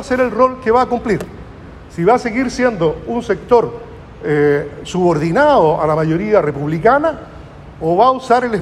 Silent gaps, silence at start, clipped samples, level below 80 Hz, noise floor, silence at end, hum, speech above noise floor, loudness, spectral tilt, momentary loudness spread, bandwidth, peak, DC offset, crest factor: none; 0 s; under 0.1%; -40 dBFS; -35 dBFS; 0 s; none; 20 dB; -15 LUFS; -7 dB/octave; 15 LU; 12 kHz; 0 dBFS; under 0.1%; 14 dB